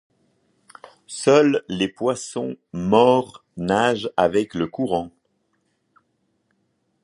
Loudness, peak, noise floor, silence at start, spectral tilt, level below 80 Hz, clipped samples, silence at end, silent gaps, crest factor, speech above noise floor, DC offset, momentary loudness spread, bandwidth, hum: -21 LUFS; -2 dBFS; -70 dBFS; 1.1 s; -5 dB/octave; -56 dBFS; under 0.1%; 1.95 s; none; 20 dB; 50 dB; under 0.1%; 14 LU; 11.5 kHz; none